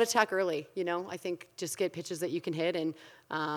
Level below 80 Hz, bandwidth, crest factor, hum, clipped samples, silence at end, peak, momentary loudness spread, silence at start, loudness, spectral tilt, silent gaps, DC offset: -86 dBFS; 19 kHz; 24 dB; none; under 0.1%; 0 s; -10 dBFS; 10 LU; 0 s; -33 LUFS; -3.5 dB/octave; none; under 0.1%